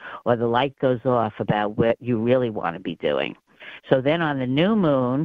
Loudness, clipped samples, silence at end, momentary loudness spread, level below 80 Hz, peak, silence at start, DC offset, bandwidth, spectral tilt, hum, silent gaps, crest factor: -22 LUFS; under 0.1%; 0 s; 8 LU; -56 dBFS; -2 dBFS; 0 s; under 0.1%; 5 kHz; -9 dB/octave; none; none; 20 dB